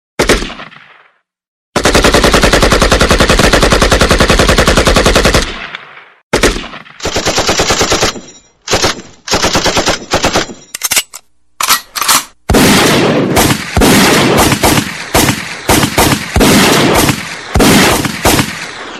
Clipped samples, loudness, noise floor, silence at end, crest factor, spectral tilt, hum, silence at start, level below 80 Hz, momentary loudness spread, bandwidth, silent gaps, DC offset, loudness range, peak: 0.2%; -9 LUFS; -50 dBFS; 0 s; 10 dB; -3.5 dB/octave; none; 0.2 s; -20 dBFS; 11 LU; 17 kHz; 1.48-1.73 s, 6.23-6.31 s; under 0.1%; 5 LU; 0 dBFS